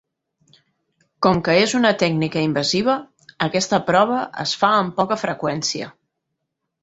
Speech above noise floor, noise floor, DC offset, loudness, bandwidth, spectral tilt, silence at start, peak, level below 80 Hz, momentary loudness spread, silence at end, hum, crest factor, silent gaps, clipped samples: 59 dB; -78 dBFS; under 0.1%; -19 LUFS; 8.2 kHz; -4.5 dB/octave; 1.2 s; -2 dBFS; -56 dBFS; 7 LU; 0.95 s; none; 18 dB; none; under 0.1%